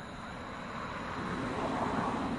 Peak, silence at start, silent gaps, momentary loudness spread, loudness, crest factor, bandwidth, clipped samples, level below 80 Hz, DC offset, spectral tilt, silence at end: -22 dBFS; 0 s; none; 9 LU; -36 LUFS; 14 dB; 11.5 kHz; under 0.1%; -54 dBFS; under 0.1%; -6 dB/octave; 0 s